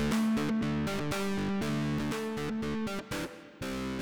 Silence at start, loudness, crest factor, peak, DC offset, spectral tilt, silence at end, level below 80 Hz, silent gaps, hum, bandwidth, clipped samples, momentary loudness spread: 0 s; -33 LUFS; 12 dB; -18 dBFS; 0.3%; -5.5 dB/octave; 0 s; -52 dBFS; none; none; over 20 kHz; under 0.1%; 8 LU